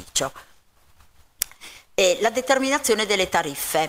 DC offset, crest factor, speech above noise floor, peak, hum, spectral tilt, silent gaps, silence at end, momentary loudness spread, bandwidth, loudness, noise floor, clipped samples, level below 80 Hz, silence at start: under 0.1%; 24 dB; 33 dB; 0 dBFS; none; -2 dB/octave; none; 0 s; 10 LU; 16 kHz; -22 LUFS; -55 dBFS; under 0.1%; -54 dBFS; 0 s